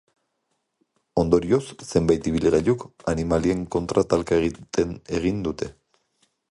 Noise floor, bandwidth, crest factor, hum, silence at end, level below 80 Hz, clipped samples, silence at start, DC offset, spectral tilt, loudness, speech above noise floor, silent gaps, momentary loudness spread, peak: -75 dBFS; 11.5 kHz; 20 dB; none; 0.8 s; -42 dBFS; under 0.1%; 1.15 s; under 0.1%; -6.5 dB/octave; -23 LUFS; 53 dB; none; 7 LU; -4 dBFS